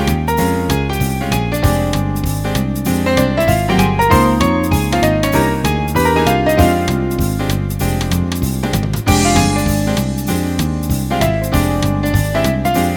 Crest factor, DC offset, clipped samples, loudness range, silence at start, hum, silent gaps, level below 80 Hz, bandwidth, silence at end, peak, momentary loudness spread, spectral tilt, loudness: 14 dB; under 0.1%; under 0.1%; 3 LU; 0 s; none; none; -26 dBFS; 19 kHz; 0 s; 0 dBFS; 6 LU; -5.5 dB/octave; -15 LUFS